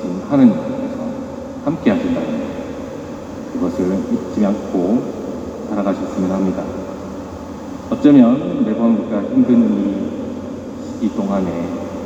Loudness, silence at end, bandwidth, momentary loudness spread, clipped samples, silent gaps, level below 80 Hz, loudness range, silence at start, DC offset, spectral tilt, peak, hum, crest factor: -18 LUFS; 0 s; 8.2 kHz; 16 LU; under 0.1%; none; -46 dBFS; 6 LU; 0 s; under 0.1%; -8 dB/octave; 0 dBFS; none; 18 dB